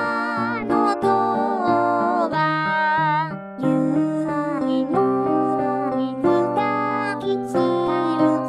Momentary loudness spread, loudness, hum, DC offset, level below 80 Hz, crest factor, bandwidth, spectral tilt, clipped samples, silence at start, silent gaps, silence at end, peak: 4 LU; -21 LUFS; none; under 0.1%; -58 dBFS; 14 dB; 11 kHz; -7 dB/octave; under 0.1%; 0 s; none; 0 s; -6 dBFS